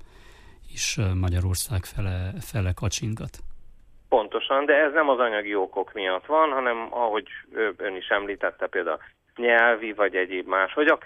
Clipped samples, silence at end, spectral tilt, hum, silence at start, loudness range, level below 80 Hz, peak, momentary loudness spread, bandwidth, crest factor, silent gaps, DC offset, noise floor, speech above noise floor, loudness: under 0.1%; 0 s; -4.5 dB/octave; none; 0 s; 5 LU; -46 dBFS; -6 dBFS; 11 LU; 15 kHz; 18 dB; none; under 0.1%; -48 dBFS; 24 dB; -24 LUFS